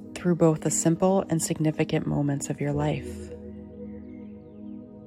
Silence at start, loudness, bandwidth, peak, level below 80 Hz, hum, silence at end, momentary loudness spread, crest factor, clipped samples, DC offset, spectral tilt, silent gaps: 0 s; -25 LUFS; 15 kHz; -8 dBFS; -52 dBFS; none; 0 s; 19 LU; 18 dB; under 0.1%; under 0.1%; -6 dB/octave; none